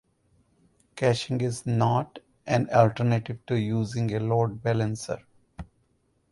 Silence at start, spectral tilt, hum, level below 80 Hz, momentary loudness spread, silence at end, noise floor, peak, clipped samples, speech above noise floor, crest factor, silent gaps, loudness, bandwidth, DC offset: 0.95 s; -6.5 dB/octave; none; -56 dBFS; 19 LU; 0.7 s; -69 dBFS; -6 dBFS; under 0.1%; 44 dB; 22 dB; none; -26 LUFS; 11.5 kHz; under 0.1%